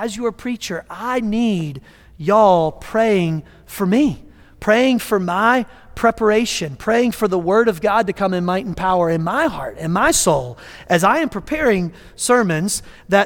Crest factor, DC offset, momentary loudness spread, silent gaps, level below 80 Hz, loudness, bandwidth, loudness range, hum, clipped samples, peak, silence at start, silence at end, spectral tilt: 16 dB; under 0.1%; 11 LU; none; -44 dBFS; -18 LUFS; 19 kHz; 1 LU; none; under 0.1%; -2 dBFS; 0 s; 0 s; -4.5 dB/octave